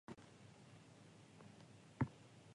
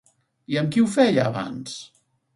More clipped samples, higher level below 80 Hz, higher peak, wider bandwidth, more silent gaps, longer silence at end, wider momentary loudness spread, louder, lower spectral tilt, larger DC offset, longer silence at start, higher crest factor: neither; second, -70 dBFS vs -64 dBFS; second, -28 dBFS vs -4 dBFS; about the same, 11 kHz vs 11.5 kHz; neither; second, 0 s vs 0.5 s; about the same, 17 LU vs 16 LU; second, -51 LUFS vs -22 LUFS; about the same, -7 dB/octave vs -6 dB/octave; neither; second, 0.1 s vs 0.5 s; first, 26 dB vs 20 dB